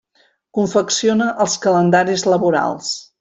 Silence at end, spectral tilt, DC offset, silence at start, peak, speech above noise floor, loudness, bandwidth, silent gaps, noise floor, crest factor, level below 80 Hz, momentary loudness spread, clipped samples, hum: 0.2 s; -4 dB/octave; under 0.1%; 0.55 s; -2 dBFS; 43 dB; -17 LUFS; 8.4 kHz; none; -59 dBFS; 14 dB; -60 dBFS; 8 LU; under 0.1%; none